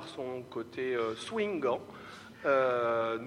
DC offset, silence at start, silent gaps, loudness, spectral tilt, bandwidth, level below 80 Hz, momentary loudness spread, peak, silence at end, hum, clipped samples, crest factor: under 0.1%; 0 s; none; -32 LUFS; -5 dB/octave; 12.5 kHz; -72 dBFS; 14 LU; -18 dBFS; 0 s; none; under 0.1%; 14 dB